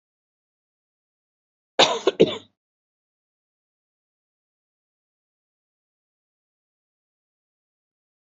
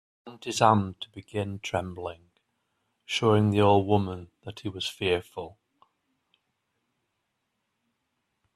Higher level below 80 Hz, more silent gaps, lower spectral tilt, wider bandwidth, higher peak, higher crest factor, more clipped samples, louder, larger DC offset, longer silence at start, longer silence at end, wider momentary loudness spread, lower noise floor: second, -72 dBFS vs -64 dBFS; neither; second, -2 dB/octave vs -5.5 dB/octave; second, 7.6 kHz vs 13 kHz; first, -2 dBFS vs -6 dBFS; about the same, 28 dB vs 24 dB; neither; first, -20 LUFS vs -26 LUFS; neither; first, 1.8 s vs 0.25 s; first, 5.95 s vs 3.05 s; second, 12 LU vs 19 LU; first, under -90 dBFS vs -79 dBFS